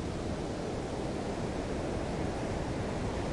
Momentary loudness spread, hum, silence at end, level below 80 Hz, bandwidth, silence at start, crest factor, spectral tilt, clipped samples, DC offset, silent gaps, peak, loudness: 1 LU; none; 0 s; -44 dBFS; 11.5 kHz; 0 s; 14 dB; -6 dB/octave; under 0.1%; under 0.1%; none; -22 dBFS; -36 LUFS